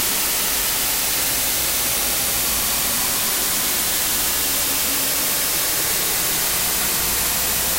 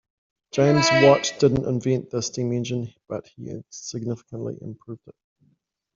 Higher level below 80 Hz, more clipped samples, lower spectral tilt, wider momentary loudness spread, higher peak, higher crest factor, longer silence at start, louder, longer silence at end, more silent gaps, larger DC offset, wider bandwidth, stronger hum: first, -40 dBFS vs -56 dBFS; neither; second, 0 dB/octave vs -5 dB/octave; second, 0 LU vs 21 LU; about the same, -6 dBFS vs -4 dBFS; second, 14 dB vs 20 dB; second, 0 s vs 0.55 s; first, -17 LUFS vs -22 LUFS; second, 0 s vs 0.85 s; neither; neither; first, 16 kHz vs 7.6 kHz; neither